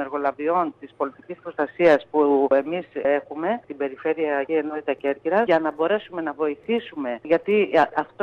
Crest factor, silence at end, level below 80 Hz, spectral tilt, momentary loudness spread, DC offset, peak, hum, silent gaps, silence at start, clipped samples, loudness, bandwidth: 16 dB; 0 s; -66 dBFS; -7 dB/octave; 11 LU; under 0.1%; -6 dBFS; none; none; 0 s; under 0.1%; -23 LUFS; 7 kHz